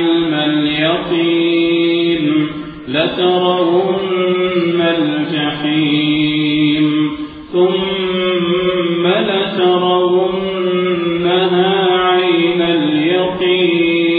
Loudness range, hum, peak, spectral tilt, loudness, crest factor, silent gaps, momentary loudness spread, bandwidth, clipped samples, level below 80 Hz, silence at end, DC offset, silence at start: 1 LU; none; -2 dBFS; -9 dB/octave; -14 LUFS; 12 dB; none; 4 LU; 4.8 kHz; under 0.1%; -48 dBFS; 0 s; under 0.1%; 0 s